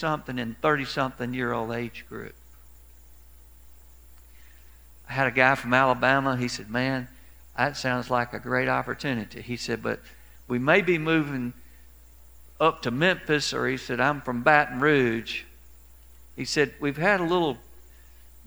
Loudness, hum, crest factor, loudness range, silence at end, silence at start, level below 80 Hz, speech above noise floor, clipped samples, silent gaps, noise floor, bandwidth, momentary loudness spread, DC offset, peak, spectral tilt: -25 LUFS; none; 24 dB; 7 LU; 0.75 s; 0 s; -52 dBFS; 26 dB; under 0.1%; none; -52 dBFS; over 20 kHz; 14 LU; 0.2%; -2 dBFS; -5 dB/octave